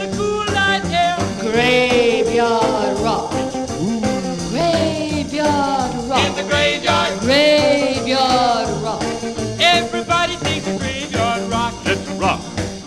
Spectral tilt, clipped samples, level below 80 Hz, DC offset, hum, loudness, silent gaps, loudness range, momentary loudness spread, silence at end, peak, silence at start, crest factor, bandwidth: -4 dB/octave; under 0.1%; -40 dBFS; under 0.1%; none; -17 LUFS; none; 3 LU; 8 LU; 0 s; 0 dBFS; 0 s; 16 dB; 14 kHz